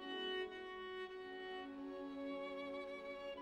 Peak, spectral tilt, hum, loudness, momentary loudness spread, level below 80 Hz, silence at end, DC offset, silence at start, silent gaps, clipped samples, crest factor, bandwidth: -34 dBFS; -4.5 dB/octave; none; -47 LUFS; 6 LU; -76 dBFS; 0 s; under 0.1%; 0 s; none; under 0.1%; 14 dB; 10.5 kHz